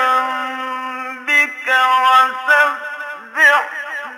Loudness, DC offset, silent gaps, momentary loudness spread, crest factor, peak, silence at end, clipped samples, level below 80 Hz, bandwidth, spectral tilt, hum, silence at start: -14 LUFS; under 0.1%; none; 14 LU; 14 dB; -2 dBFS; 0 s; under 0.1%; -72 dBFS; 16 kHz; 0.5 dB/octave; none; 0 s